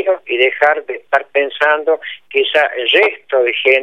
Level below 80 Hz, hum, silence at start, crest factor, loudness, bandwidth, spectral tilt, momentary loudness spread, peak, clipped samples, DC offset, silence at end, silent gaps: -74 dBFS; none; 0 s; 14 dB; -14 LUFS; 9 kHz; -2.5 dB/octave; 6 LU; 0 dBFS; under 0.1%; 0.3%; 0 s; none